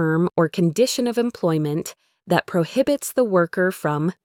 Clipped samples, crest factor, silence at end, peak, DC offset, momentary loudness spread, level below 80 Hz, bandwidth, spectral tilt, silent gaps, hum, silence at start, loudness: under 0.1%; 18 dB; 0.1 s; -4 dBFS; under 0.1%; 4 LU; -62 dBFS; 18 kHz; -5.5 dB/octave; none; none; 0 s; -21 LUFS